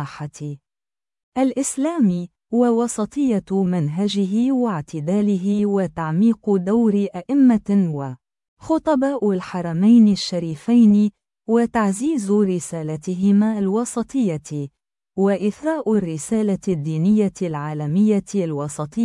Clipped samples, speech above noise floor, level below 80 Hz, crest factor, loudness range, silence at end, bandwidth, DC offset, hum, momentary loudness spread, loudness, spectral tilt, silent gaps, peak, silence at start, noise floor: under 0.1%; over 71 dB; -56 dBFS; 14 dB; 4 LU; 0 s; 12 kHz; under 0.1%; none; 11 LU; -20 LUFS; -7 dB/octave; 1.23-1.32 s, 8.48-8.57 s; -6 dBFS; 0 s; under -90 dBFS